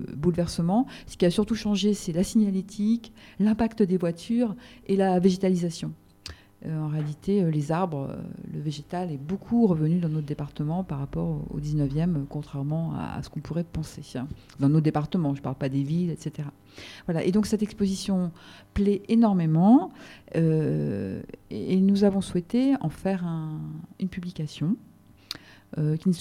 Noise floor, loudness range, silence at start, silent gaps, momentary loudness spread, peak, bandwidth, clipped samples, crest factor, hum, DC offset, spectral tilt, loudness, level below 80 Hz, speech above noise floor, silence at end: -45 dBFS; 6 LU; 0 s; none; 15 LU; -8 dBFS; 13.5 kHz; under 0.1%; 18 dB; none; under 0.1%; -7.5 dB/octave; -26 LUFS; -50 dBFS; 20 dB; 0 s